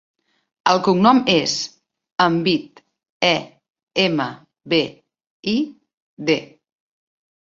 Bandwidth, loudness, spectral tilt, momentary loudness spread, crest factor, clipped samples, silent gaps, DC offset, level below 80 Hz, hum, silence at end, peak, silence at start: 7.8 kHz; -19 LUFS; -4.5 dB/octave; 14 LU; 20 dB; under 0.1%; 2.12-2.16 s, 3.10-3.20 s, 3.70-3.74 s, 3.83-3.87 s, 5.30-5.43 s, 5.94-6.17 s; under 0.1%; -60 dBFS; none; 0.95 s; -2 dBFS; 0.65 s